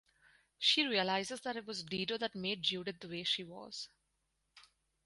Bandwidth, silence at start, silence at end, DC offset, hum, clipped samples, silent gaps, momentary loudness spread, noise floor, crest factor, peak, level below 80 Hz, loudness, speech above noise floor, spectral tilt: 11.5 kHz; 0.6 s; 0.45 s; under 0.1%; none; under 0.1%; none; 15 LU; -82 dBFS; 22 dB; -18 dBFS; -76 dBFS; -36 LUFS; 45 dB; -3 dB/octave